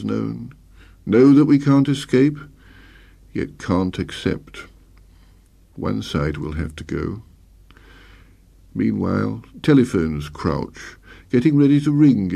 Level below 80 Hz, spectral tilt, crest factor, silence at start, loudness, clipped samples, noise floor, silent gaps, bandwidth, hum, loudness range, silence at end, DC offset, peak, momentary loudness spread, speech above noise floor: -42 dBFS; -7.5 dB/octave; 16 dB; 0 s; -19 LUFS; under 0.1%; -51 dBFS; none; 11 kHz; none; 10 LU; 0 s; under 0.1%; -4 dBFS; 18 LU; 33 dB